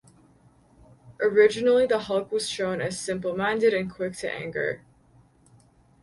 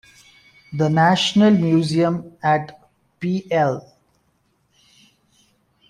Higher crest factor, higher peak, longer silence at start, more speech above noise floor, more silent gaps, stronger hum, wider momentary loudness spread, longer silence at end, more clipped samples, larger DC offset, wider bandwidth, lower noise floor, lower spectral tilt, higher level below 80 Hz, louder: about the same, 20 dB vs 16 dB; about the same, -6 dBFS vs -4 dBFS; first, 1.05 s vs 0.7 s; second, 34 dB vs 47 dB; neither; neither; second, 11 LU vs 14 LU; second, 1.25 s vs 2.1 s; neither; neither; about the same, 11.5 kHz vs 10.5 kHz; second, -58 dBFS vs -65 dBFS; second, -4.5 dB/octave vs -6 dB/octave; about the same, -62 dBFS vs -60 dBFS; second, -25 LUFS vs -18 LUFS